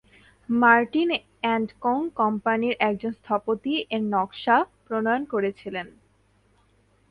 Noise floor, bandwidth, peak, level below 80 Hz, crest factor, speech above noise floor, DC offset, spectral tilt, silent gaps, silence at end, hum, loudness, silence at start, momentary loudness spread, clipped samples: -63 dBFS; 5 kHz; -4 dBFS; -64 dBFS; 22 dB; 39 dB; under 0.1%; -7 dB/octave; none; 1.2 s; none; -24 LUFS; 0.5 s; 10 LU; under 0.1%